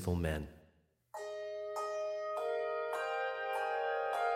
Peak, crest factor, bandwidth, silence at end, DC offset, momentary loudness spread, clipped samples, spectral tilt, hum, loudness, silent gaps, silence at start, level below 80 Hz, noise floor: -20 dBFS; 16 dB; 16.5 kHz; 0 s; under 0.1%; 8 LU; under 0.1%; -5.5 dB/octave; none; -38 LUFS; none; 0 s; -54 dBFS; -71 dBFS